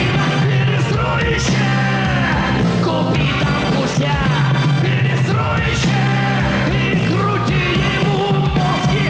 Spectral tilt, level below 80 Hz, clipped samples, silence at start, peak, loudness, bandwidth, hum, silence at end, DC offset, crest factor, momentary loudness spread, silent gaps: -6 dB/octave; -32 dBFS; under 0.1%; 0 s; -8 dBFS; -16 LUFS; 8.8 kHz; none; 0 s; under 0.1%; 8 dB; 1 LU; none